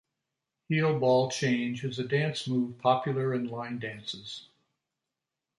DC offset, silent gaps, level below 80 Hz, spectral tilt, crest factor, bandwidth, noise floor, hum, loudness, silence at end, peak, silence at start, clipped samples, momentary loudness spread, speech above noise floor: under 0.1%; none; -72 dBFS; -6 dB/octave; 20 dB; 11.5 kHz; -88 dBFS; none; -29 LUFS; 1.2 s; -10 dBFS; 0.7 s; under 0.1%; 12 LU; 59 dB